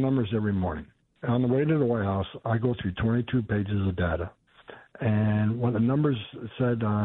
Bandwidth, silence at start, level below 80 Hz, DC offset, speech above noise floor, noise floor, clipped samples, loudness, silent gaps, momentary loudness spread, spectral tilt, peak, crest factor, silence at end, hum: 4 kHz; 0 s; -48 dBFS; under 0.1%; 24 dB; -50 dBFS; under 0.1%; -27 LUFS; none; 8 LU; -11.5 dB/octave; -12 dBFS; 16 dB; 0 s; none